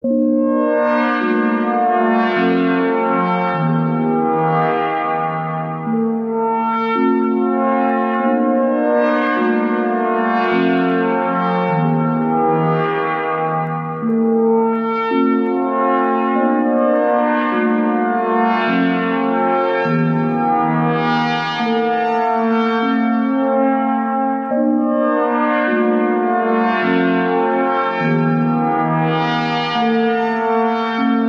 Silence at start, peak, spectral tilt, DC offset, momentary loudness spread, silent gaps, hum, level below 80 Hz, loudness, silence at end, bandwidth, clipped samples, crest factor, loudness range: 0.05 s; -4 dBFS; -8.5 dB/octave; under 0.1%; 3 LU; none; none; -70 dBFS; -16 LUFS; 0 s; 6.2 kHz; under 0.1%; 12 dB; 1 LU